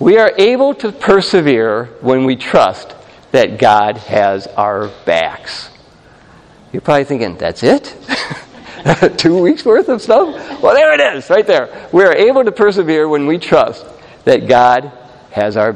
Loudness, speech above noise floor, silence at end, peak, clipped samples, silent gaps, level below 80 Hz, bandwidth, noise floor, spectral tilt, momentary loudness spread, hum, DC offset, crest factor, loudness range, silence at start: -12 LUFS; 31 dB; 0 s; 0 dBFS; 0.2%; none; -48 dBFS; 10 kHz; -43 dBFS; -5.5 dB/octave; 10 LU; none; under 0.1%; 12 dB; 7 LU; 0 s